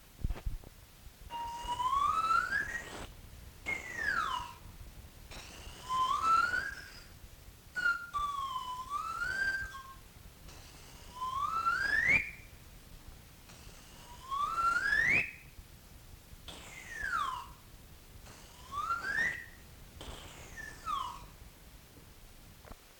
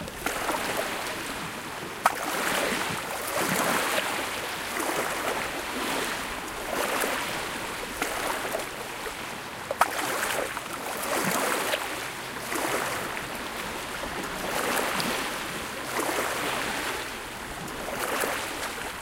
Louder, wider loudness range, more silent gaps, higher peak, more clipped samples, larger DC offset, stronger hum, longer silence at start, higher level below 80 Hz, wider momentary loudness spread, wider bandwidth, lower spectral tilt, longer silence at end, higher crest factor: second, -33 LUFS vs -29 LUFS; first, 6 LU vs 3 LU; neither; second, -18 dBFS vs -6 dBFS; neither; neither; neither; about the same, 0 s vs 0 s; about the same, -52 dBFS vs -54 dBFS; first, 26 LU vs 8 LU; first, 19 kHz vs 17 kHz; about the same, -2.5 dB/octave vs -2 dB/octave; about the same, 0 s vs 0 s; about the same, 20 dB vs 24 dB